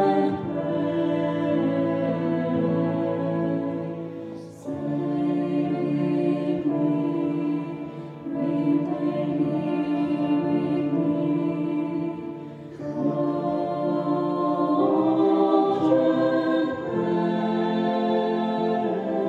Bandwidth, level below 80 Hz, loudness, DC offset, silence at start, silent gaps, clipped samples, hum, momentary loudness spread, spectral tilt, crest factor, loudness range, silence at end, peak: 6.8 kHz; -68 dBFS; -24 LUFS; under 0.1%; 0 s; none; under 0.1%; none; 10 LU; -9 dB/octave; 16 dB; 5 LU; 0 s; -6 dBFS